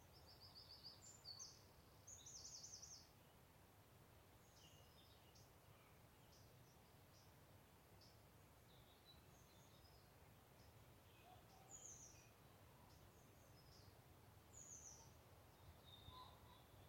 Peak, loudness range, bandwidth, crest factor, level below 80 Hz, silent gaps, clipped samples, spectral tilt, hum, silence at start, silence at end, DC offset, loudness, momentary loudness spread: -46 dBFS; 9 LU; 16.5 kHz; 20 dB; -78 dBFS; none; under 0.1%; -2.5 dB/octave; none; 0 s; 0 s; under 0.1%; -64 LUFS; 11 LU